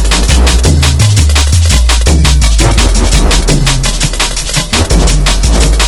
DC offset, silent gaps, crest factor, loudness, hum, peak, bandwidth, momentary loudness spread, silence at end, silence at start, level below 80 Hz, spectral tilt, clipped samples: under 0.1%; none; 6 dB; -9 LUFS; none; 0 dBFS; 12 kHz; 3 LU; 0 s; 0 s; -8 dBFS; -3.5 dB/octave; 1%